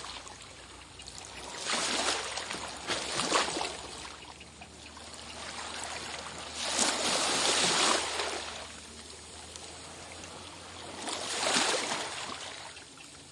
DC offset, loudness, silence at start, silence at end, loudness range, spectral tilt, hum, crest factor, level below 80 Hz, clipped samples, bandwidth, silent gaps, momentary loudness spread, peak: under 0.1%; -31 LUFS; 0 s; 0 s; 9 LU; -0.5 dB/octave; none; 24 dB; -62 dBFS; under 0.1%; 11.5 kHz; none; 19 LU; -12 dBFS